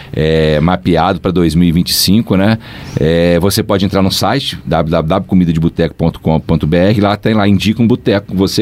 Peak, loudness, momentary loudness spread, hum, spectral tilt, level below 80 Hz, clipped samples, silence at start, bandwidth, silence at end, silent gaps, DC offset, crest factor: 0 dBFS; -12 LUFS; 4 LU; none; -6 dB/octave; -30 dBFS; under 0.1%; 0 s; 16 kHz; 0 s; none; under 0.1%; 12 dB